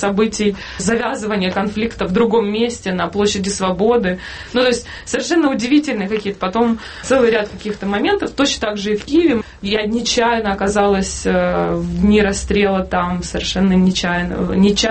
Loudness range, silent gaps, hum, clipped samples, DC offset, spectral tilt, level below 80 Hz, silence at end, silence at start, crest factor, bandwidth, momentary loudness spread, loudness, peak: 2 LU; none; none; under 0.1%; under 0.1%; -5 dB/octave; -36 dBFS; 0 s; 0 s; 14 dB; 8.8 kHz; 6 LU; -17 LUFS; -2 dBFS